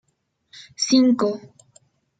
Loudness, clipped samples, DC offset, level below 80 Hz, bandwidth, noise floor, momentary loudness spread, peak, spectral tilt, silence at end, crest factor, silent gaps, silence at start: -19 LUFS; under 0.1%; under 0.1%; -70 dBFS; 9.2 kHz; -71 dBFS; 19 LU; -6 dBFS; -3.5 dB/octave; 0.8 s; 18 dB; none; 0.55 s